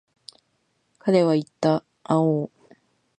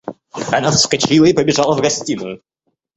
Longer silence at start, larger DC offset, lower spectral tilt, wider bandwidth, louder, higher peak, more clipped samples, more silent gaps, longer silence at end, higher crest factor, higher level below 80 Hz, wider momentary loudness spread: first, 1.05 s vs 0.05 s; neither; first, -7.5 dB/octave vs -4 dB/octave; first, 9.8 kHz vs 8.2 kHz; second, -23 LUFS vs -14 LUFS; second, -6 dBFS vs 0 dBFS; neither; neither; first, 0.75 s vs 0.6 s; about the same, 20 dB vs 16 dB; second, -72 dBFS vs -48 dBFS; second, 9 LU vs 17 LU